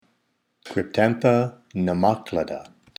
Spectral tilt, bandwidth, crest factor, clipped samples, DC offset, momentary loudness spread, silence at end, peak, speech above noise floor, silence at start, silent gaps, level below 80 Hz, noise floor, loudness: -7.5 dB/octave; 15.5 kHz; 20 dB; under 0.1%; under 0.1%; 11 LU; 0.35 s; -4 dBFS; 49 dB; 0.65 s; none; -58 dBFS; -71 dBFS; -23 LUFS